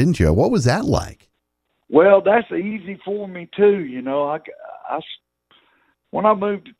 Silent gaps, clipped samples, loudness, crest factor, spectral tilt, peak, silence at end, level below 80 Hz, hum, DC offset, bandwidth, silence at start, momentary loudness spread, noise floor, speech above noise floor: none; under 0.1%; -19 LUFS; 18 dB; -7 dB/octave; 0 dBFS; 0.1 s; -38 dBFS; none; under 0.1%; 12.5 kHz; 0 s; 16 LU; -73 dBFS; 54 dB